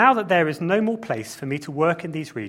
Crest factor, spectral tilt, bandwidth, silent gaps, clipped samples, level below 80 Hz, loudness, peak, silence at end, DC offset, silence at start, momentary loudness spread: 20 dB; -6 dB/octave; 16.5 kHz; none; under 0.1%; -64 dBFS; -23 LUFS; -2 dBFS; 0 s; under 0.1%; 0 s; 10 LU